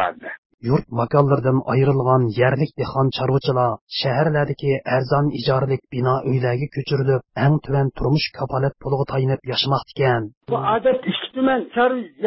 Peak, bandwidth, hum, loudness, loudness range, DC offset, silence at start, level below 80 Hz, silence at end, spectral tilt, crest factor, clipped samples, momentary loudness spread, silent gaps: -2 dBFS; 5.8 kHz; none; -20 LUFS; 2 LU; under 0.1%; 0 s; -48 dBFS; 0 s; -11 dB/octave; 18 dB; under 0.1%; 6 LU; 0.38-0.58 s, 3.81-3.87 s, 10.37-10.41 s